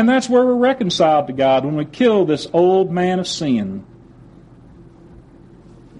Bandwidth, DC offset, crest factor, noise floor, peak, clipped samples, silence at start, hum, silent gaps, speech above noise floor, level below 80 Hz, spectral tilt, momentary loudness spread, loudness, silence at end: 11 kHz; under 0.1%; 14 dB; -44 dBFS; -4 dBFS; under 0.1%; 0 s; none; none; 28 dB; -52 dBFS; -5.5 dB/octave; 6 LU; -16 LUFS; 0 s